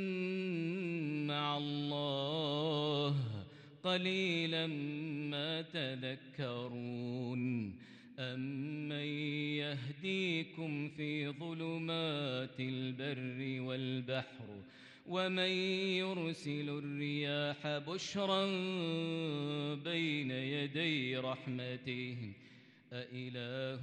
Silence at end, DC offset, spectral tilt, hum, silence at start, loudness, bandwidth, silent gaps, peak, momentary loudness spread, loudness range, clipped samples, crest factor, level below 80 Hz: 0 s; under 0.1%; -6 dB/octave; none; 0 s; -38 LUFS; 9.6 kHz; none; -22 dBFS; 9 LU; 4 LU; under 0.1%; 16 dB; -82 dBFS